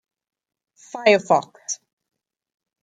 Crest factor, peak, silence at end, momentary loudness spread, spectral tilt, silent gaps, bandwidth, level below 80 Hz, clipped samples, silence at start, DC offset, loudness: 22 dB; -2 dBFS; 1.05 s; 14 LU; -3 dB/octave; none; 9.4 kHz; -74 dBFS; under 0.1%; 0.95 s; under 0.1%; -20 LUFS